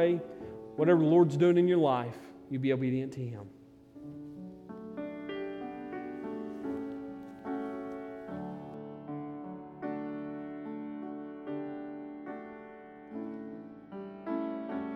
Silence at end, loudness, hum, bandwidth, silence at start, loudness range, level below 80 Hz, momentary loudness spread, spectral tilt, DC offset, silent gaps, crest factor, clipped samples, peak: 0 s; -33 LUFS; none; 8 kHz; 0 s; 14 LU; -72 dBFS; 21 LU; -8.5 dB/octave; under 0.1%; none; 20 dB; under 0.1%; -14 dBFS